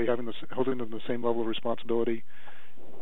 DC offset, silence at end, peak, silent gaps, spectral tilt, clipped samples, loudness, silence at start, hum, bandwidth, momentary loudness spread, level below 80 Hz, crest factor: 5%; 0 s; -14 dBFS; none; -8 dB/octave; under 0.1%; -32 LUFS; 0 s; none; over 20 kHz; 16 LU; -76 dBFS; 18 dB